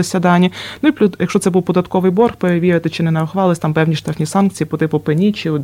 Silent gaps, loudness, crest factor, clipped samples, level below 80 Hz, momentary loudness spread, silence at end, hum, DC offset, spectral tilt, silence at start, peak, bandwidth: none; -15 LUFS; 12 dB; under 0.1%; -50 dBFS; 4 LU; 0 s; none; under 0.1%; -6.5 dB/octave; 0 s; -2 dBFS; 15.5 kHz